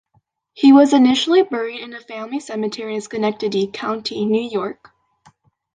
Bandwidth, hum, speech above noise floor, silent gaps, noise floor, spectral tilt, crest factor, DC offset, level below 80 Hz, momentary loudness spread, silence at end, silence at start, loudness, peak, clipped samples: 9.4 kHz; none; 46 dB; none; -64 dBFS; -5 dB/octave; 16 dB; under 0.1%; -64 dBFS; 16 LU; 1.05 s; 0.55 s; -17 LUFS; -2 dBFS; under 0.1%